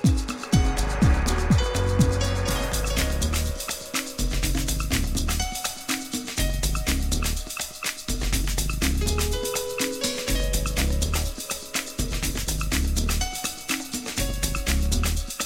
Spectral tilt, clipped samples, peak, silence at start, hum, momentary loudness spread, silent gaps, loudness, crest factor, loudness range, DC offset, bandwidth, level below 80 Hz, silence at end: -4 dB/octave; under 0.1%; -10 dBFS; 0 s; none; 6 LU; none; -26 LUFS; 14 dB; 3 LU; under 0.1%; 16.5 kHz; -28 dBFS; 0 s